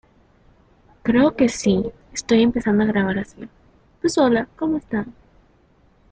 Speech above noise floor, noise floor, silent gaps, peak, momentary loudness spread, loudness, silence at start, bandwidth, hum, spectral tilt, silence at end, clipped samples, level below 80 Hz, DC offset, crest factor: 37 dB; -56 dBFS; none; -4 dBFS; 13 LU; -20 LUFS; 1.05 s; 9.4 kHz; none; -5.5 dB/octave; 1 s; under 0.1%; -48 dBFS; under 0.1%; 18 dB